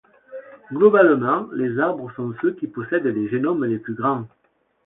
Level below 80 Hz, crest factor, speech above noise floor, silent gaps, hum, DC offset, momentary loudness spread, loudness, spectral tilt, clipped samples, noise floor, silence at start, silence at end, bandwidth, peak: -66 dBFS; 18 dB; 20 dB; none; none; under 0.1%; 23 LU; -21 LUFS; -12 dB/octave; under 0.1%; -40 dBFS; 0.3 s; 0.6 s; 3.9 kHz; -2 dBFS